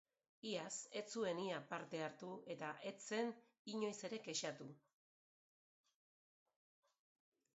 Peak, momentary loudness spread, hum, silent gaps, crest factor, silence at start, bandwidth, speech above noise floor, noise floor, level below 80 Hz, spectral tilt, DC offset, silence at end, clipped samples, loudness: -30 dBFS; 8 LU; none; 3.59-3.65 s; 20 dB; 0.45 s; 8 kHz; over 43 dB; under -90 dBFS; under -90 dBFS; -3 dB/octave; under 0.1%; 2.75 s; under 0.1%; -47 LUFS